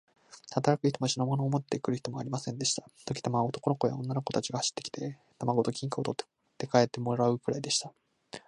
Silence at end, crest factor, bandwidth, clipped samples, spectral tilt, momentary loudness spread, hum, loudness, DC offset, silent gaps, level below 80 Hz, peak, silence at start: 0.1 s; 22 dB; 11 kHz; under 0.1%; -5 dB/octave; 10 LU; none; -31 LUFS; under 0.1%; none; -70 dBFS; -8 dBFS; 0.3 s